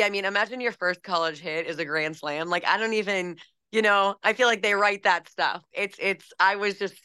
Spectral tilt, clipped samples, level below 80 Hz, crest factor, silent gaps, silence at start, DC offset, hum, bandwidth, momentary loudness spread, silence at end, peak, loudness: -3 dB/octave; under 0.1%; -80 dBFS; 18 dB; none; 0 s; under 0.1%; none; 12.5 kHz; 8 LU; 0.15 s; -8 dBFS; -25 LUFS